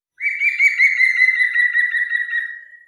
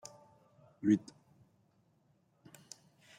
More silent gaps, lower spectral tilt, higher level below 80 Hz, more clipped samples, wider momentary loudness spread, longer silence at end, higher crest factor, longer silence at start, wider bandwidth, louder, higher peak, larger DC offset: neither; second, 7 dB/octave vs -6.5 dB/octave; second, -90 dBFS vs -82 dBFS; neither; second, 10 LU vs 23 LU; second, 0.1 s vs 2.2 s; second, 14 dB vs 24 dB; second, 0.2 s vs 0.85 s; second, 12 kHz vs 15 kHz; first, -15 LUFS vs -33 LUFS; first, -4 dBFS vs -16 dBFS; neither